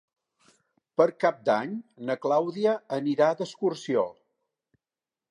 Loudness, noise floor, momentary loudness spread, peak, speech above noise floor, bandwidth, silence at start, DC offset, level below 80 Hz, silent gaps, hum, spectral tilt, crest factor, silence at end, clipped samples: -27 LUFS; under -90 dBFS; 9 LU; -8 dBFS; over 64 dB; 11 kHz; 1 s; under 0.1%; -82 dBFS; none; none; -6 dB/octave; 20 dB; 1.2 s; under 0.1%